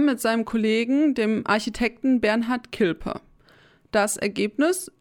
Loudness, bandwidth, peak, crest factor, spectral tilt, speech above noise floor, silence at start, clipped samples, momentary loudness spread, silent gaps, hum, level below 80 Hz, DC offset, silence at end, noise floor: -23 LUFS; 18 kHz; -8 dBFS; 16 dB; -4 dB/octave; 33 dB; 0 s; under 0.1%; 5 LU; none; none; -50 dBFS; under 0.1%; 0.1 s; -56 dBFS